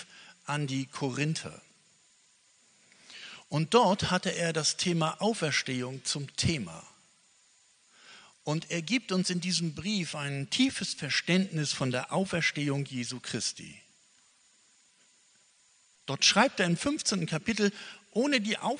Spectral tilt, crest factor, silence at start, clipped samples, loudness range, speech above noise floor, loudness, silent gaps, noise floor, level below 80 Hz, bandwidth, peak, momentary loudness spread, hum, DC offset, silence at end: -4 dB/octave; 24 dB; 0 s; under 0.1%; 7 LU; 35 dB; -29 LUFS; none; -65 dBFS; -64 dBFS; 10 kHz; -8 dBFS; 15 LU; none; under 0.1%; 0 s